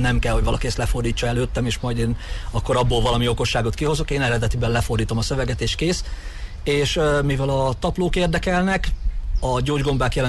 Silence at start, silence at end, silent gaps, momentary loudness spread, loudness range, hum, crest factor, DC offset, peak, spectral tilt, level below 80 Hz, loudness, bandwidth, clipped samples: 0 s; 0 s; none; 7 LU; 1 LU; none; 10 dB; under 0.1%; -10 dBFS; -5.5 dB/octave; -28 dBFS; -22 LUFS; 12.5 kHz; under 0.1%